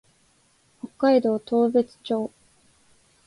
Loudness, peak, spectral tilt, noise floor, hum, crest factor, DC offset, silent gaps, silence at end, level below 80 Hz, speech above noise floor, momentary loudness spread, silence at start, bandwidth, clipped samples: -23 LUFS; -8 dBFS; -6.5 dB/octave; -63 dBFS; none; 16 dB; under 0.1%; none; 1 s; -70 dBFS; 41 dB; 17 LU; 0.85 s; 11.5 kHz; under 0.1%